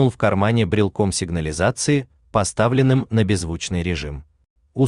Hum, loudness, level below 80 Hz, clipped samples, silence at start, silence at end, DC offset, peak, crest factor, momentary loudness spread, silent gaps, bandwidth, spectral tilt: none; -20 LUFS; -42 dBFS; under 0.1%; 0 s; 0 s; under 0.1%; -4 dBFS; 16 dB; 7 LU; 4.50-4.56 s; 11 kHz; -5.5 dB/octave